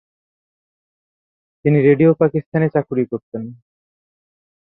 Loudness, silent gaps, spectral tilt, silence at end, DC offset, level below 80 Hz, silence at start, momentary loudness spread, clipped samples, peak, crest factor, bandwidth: -17 LUFS; 2.46-2.52 s, 3.23-3.32 s; -13.5 dB/octave; 1.25 s; under 0.1%; -60 dBFS; 1.65 s; 17 LU; under 0.1%; -2 dBFS; 18 dB; 4 kHz